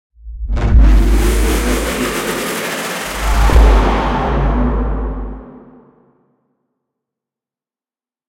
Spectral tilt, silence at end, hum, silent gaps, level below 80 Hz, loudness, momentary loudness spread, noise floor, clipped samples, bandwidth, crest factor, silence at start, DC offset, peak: -5.5 dB/octave; 2.7 s; none; none; -16 dBFS; -15 LUFS; 13 LU; under -90 dBFS; under 0.1%; 16.5 kHz; 14 dB; 0.25 s; under 0.1%; 0 dBFS